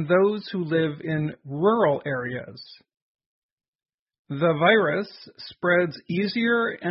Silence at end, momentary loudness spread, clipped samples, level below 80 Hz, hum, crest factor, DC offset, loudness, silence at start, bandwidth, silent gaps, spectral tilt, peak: 0 s; 16 LU; under 0.1%; -66 dBFS; none; 18 dB; under 0.1%; -23 LUFS; 0 s; 5.8 kHz; 3.02-3.15 s, 3.26-3.58 s, 3.68-3.79 s, 3.94-4.06 s, 4.19-4.25 s; -10.5 dB/octave; -6 dBFS